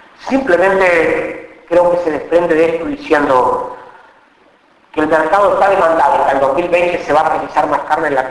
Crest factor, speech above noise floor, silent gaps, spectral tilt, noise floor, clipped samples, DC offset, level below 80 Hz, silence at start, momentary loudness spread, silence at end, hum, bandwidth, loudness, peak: 12 dB; 37 dB; none; -5.5 dB/octave; -49 dBFS; under 0.1%; under 0.1%; -44 dBFS; 0.2 s; 8 LU; 0 s; none; 11 kHz; -13 LUFS; 0 dBFS